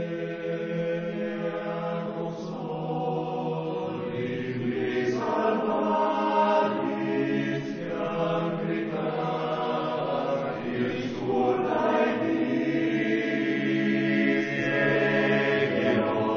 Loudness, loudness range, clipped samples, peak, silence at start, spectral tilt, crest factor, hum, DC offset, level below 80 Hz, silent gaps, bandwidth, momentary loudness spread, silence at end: -27 LUFS; 6 LU; under 0.1%; -12 dBFS; 0 s; -7 dB/octave; 14 dB; none; under 0.1%; -66 dBFS; none; 7 kHz; 8 LU; 0 s